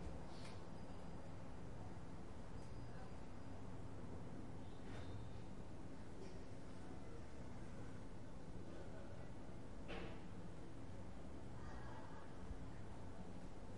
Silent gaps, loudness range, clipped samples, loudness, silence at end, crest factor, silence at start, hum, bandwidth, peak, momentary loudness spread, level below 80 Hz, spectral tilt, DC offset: none; 1 LU; under 0.1%; -56 LUFS; 0 s; 18 dB; 0 s; none; 11 kHz; -36 dBFS; 3 LU; -60 dBFS; -6.5 dB/octave; 0.3%